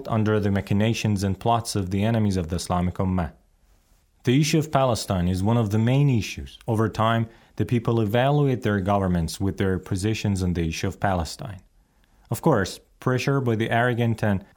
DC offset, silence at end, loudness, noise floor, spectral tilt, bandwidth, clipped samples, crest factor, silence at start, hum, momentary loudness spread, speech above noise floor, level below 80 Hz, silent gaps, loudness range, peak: under 0.1%; 0.1 s; -24 LUFS; -60 dBFS; -6.5 dB/octave; 19 kHz; under 0.1%; 18 dB; 0 s; none; 7 LU; 38 dB; -46 dBFS; none; 3 LU; -6 dBFS